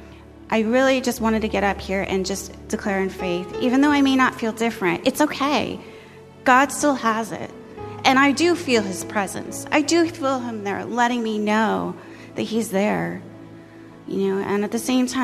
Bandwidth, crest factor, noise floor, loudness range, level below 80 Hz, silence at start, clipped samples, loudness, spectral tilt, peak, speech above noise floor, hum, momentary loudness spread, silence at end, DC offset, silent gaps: 15 kHz; 20 dB; -43 dBFS; 4 LU; -48 dBFS; 0 s; under 0.1%; -21 LUFS; -4 dB/octave; -2 dBFS; 22 dB; none; 14 LU; 0 s; under 0.1%; none